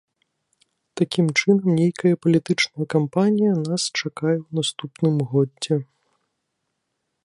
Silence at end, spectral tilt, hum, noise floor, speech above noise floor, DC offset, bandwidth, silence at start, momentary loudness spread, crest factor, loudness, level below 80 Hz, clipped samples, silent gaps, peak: 1.45 s; -5.5 dB/octave; none; -77 dBFS; 56 dB; under 0.1%; 11.5 kHz; 0.95 s; 7 LU; 18 dB; -21 LUFS; -66 dBFS; under 0.1%; none; -4 dBFS